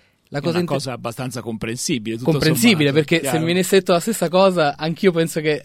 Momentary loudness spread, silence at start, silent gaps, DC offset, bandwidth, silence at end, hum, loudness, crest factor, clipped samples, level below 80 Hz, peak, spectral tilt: 12 LU; 0.3 s; none; under 0.1%; 16.5 kHz; 0 s; none; -19 LUFS; 18 dB; under 0.1%; -52 dBFS; 0 dBFS; -5 dB/octave